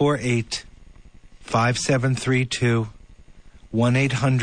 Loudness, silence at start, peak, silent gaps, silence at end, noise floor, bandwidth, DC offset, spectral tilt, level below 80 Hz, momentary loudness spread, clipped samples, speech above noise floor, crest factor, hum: -22 LUFS; 0 s; -8 dBFS; none; 0 s; -46 dBFS; 9.8 kHz; under 0.1%; -5.5 dB/octave; -46 dBFS; 9 LU; under 0.1%; 25 dB; 14 dB; none